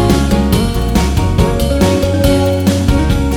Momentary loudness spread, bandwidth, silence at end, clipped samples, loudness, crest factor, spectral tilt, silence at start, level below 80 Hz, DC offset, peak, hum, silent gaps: 2 LU; 19 kHz; 0 s; under 0.1%; -13 LUFS; 12 dB; -6 dB/octave; 0 s; -18 dBFS; under 0.1%; 0 dBFS; none; none